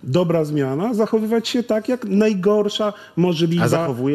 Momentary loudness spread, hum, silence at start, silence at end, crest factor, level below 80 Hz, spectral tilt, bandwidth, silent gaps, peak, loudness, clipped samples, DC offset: 4 LU; none; 0.05 s; 0 s; 14 dB; -60 dBFS; -6.5 dB/octave; 14.5 kHz; none; -4 dBFS; -19 LUFS; under 0.1%; under 0.1%